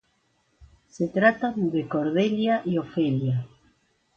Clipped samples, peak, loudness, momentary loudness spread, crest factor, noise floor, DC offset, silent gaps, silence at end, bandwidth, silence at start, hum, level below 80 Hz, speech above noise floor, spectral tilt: under 0.1%; -6 dBFS; -25 LUFS; 8 LU; 20 dB; -69 dBFS; under 0.1%; none; 0.7 s; 7.4 kHz; 0.6 s; none; -62 dBFS; 45 dB; -7.5 dB/octave